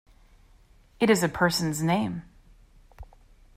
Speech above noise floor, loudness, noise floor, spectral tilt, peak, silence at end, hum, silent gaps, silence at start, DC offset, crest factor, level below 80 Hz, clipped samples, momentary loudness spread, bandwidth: 32 dB; -25 LUFS; -57 dBFS; -5 dB/octave; -10 dBFS; 0.5 s; none; none; 1 s; under 0.1%; 20 dB; -52 dBFS; under 0.1%; 8 LU; 16 kHz